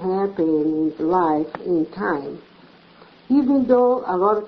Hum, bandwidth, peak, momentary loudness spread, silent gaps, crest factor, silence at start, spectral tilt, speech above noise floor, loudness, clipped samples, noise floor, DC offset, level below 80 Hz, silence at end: none; 5.6 kHz; -4 dBFS; 8 LU; none; 16 dB; 0 s; -9.5 dB/octave; 30 dB; -20 LUFS; under 0.1%; -49 dBFS; under 0.1%; -58 dBFS; 0 s